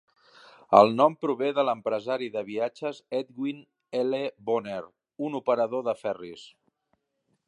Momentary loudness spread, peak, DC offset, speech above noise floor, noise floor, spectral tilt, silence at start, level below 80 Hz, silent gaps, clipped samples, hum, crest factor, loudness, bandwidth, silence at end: 15 LU; -2 dBFS; under 0.1%; 49 dB; -76 dBFS; -6.5 dB/octave; 0.7 s; -74 dBFS; none; under 0.1%; none; 26 dB; -27 LUFS; 10.5 kHz; 1 s